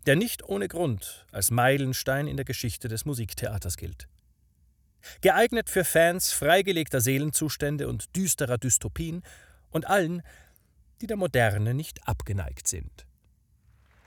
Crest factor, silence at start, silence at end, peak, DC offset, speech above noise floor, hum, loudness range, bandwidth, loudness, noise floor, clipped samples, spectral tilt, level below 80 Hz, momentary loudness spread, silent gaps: 20 dB; 0.05 s; 1.05 s; -8 dBFS; under 0.1%; 37 dB; none; 6 LU; over 20 kHz; -26 LUFS; -64 dBFS; under 0.1%; -4 dB/octave; -48 dBFS; 13 LU; none